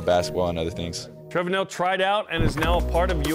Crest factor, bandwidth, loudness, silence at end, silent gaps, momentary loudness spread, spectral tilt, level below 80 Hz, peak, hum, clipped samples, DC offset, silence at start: 14 dB; 16 kHz; -24 LUFS; 0 s; none; 8 LU; -5 dB/octave; -32 dBFS; -10 dBFS; none; under 0.1%; under 0.1%; 0 s